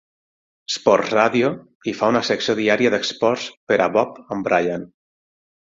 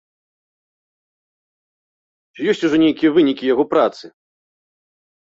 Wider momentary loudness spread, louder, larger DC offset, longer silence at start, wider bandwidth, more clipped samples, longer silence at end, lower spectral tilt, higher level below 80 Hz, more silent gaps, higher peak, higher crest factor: first, 10 LU vs 6 LU; second, -20 LUFS vs -17 LUFS; neither; second, 0.7 s vs 2.4 s; about the same, 7.8 kHz vs 7.6 kHz; neither; second, 0.9 s vs 1.3 s; second, -4.5 dB/octave vs -6 dB/octave; about the same, -60 dBFS vs -62 dBFS; first, 1.75-1.81 s, 3.57-3.67 s vs none; first, 0 dBFS vs -4 dBFS; about the same, 20 dB vs 18 dB